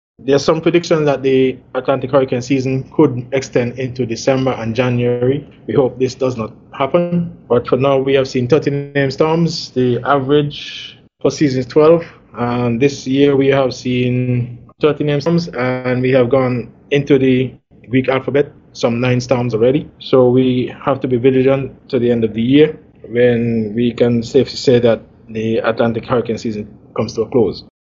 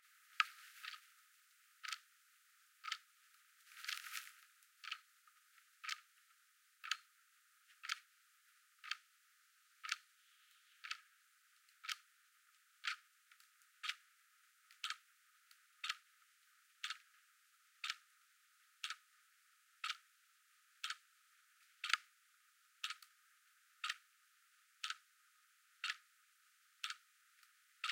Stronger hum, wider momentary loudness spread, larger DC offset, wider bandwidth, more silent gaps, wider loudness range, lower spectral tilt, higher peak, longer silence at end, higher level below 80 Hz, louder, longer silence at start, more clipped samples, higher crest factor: neither; second, 9 LU vs 22 LU; neither; second, 7.6 kHz vs 16.5 kHz; neither; about the same, 2 LU vs 4 LU; first, -7 dB/octave vs 8 dB/octave; first, 0 dBFS vs -14 dBFS; first, 0.2 s vs 0 s; first, -48 dBFS vs under -90 dBFS; first, -15 LUFS vs -47 LUFS; first, 0.2 s vs 0.05 s; neither; second, 14 dB vs 40 dB